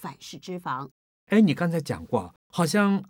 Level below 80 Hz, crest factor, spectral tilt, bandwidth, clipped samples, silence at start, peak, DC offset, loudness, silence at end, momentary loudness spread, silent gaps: -62 dBFS; 18 dB; -6 dB/octave; 16.5 kHz; under 0.1%; 0 s; -8 dBFS; under 0.1%; -26 LUFS; 0.05 s; 17 LU; 0.91-1.27 s, 2.36-2.50 s